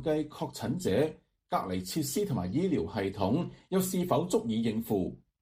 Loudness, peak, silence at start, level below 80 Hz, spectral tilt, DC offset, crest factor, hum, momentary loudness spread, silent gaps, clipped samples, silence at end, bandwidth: -31 LUFS; -12 dBFS; 0 s; -60 dBFS; -6 dB/octave; under 0.1%; 20 dB; none; 5 LU; none; under 0.1%; 0.25 s; 15.5 kHz